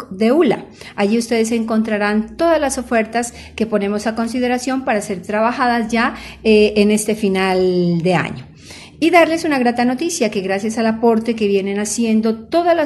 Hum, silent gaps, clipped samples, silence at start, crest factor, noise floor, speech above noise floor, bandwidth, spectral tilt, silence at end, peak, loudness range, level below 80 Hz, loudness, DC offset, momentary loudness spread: none; none; under 0.1%; 0 s; 16 dB; -38 dBFS; 22 dB; 12 kHz; -5 dB/octave; 0 s; 0 dBFS; 3 LU; -48 dBFS; -17 LUFS; under 0.1%; 7 LU